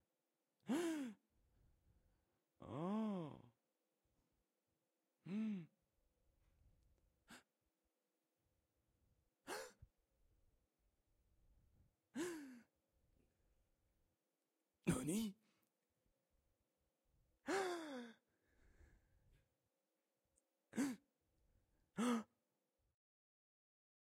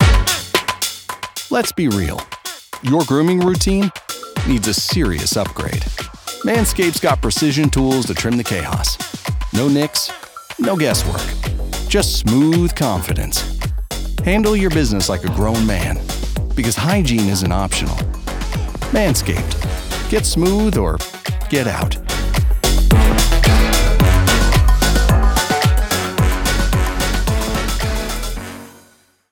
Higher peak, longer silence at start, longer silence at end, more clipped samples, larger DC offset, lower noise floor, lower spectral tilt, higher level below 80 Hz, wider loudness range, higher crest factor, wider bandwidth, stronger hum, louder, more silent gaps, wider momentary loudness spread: second, -26 dBFS vs 0 dBFS; first, 0.65 s vs 0 s; first, 1.75 s vs 0.6 s; neither; neither; first, under -90 dBFS vs -52 dBFS; about the same, -5 dB/octave vs -4.5 dB/octave; second, -78 dBFS vs -20 dBFS; first, 12 LU vs 4 LU; first, 26 dB vs 16 dB; second, 16 kHz vs 19.5 kHz; neither; second, -47 LUFS vs -17 LUFS; neither; first, 21 LU vs 10 LU